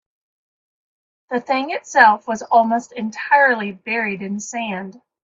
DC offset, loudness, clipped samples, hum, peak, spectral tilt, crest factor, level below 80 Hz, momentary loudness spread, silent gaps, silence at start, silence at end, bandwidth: under 0.1%; -18 LUFS; under 0.1%; none; 0 dBFS; -4 dB/octave; 20 dB; -68 dBFS; 14 LU; none; 1.3 s; 0.35 s; 8 kHz